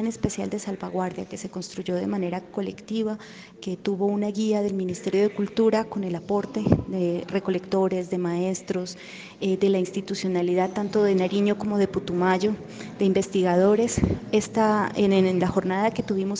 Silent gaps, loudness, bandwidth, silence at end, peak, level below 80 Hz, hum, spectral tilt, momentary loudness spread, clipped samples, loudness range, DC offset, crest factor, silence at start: none; -25 LUFS; 9.6 kHz; 0 s; -4 dBFS; -50 dBFS; none; -6 dB/octave; 10 LU; under 0.1%; 6 LU; under 0.1%; 20 dB; 0 s